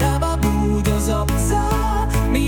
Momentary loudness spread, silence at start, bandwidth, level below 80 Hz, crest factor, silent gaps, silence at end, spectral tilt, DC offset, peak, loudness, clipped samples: 1 LU; 0 s; 18 kHz; -22 dBFS; 14 dB; none; 0 s; -6 dB/octave; under 0.1%; -4 dBFS; -19 LUFS; under 0.1%